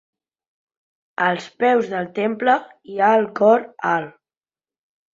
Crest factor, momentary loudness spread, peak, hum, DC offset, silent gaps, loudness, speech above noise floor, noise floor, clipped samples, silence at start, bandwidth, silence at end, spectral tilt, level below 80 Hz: 18 dB; 9 LU; -2 dBFS; none; under 0.1%; none; -19 LUFS; over 71 dB; under -90 dBFS; under 0.1%; 1.2 s; 7.6 kHz; 1.05 s; -6 dB/octave; -70 dBFS